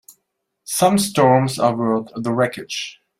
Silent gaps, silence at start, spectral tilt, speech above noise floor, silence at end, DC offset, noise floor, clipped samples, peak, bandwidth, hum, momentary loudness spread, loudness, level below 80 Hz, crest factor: none; 0.65 s; -5 dB/octave; 57 dB; 0.25 s; under 0.1%; -75 dBFS; under 0.1%; -2 dBFS; 16 kHz; none; 11 LU; -18 LUFS; -58 dBFS; 18 dB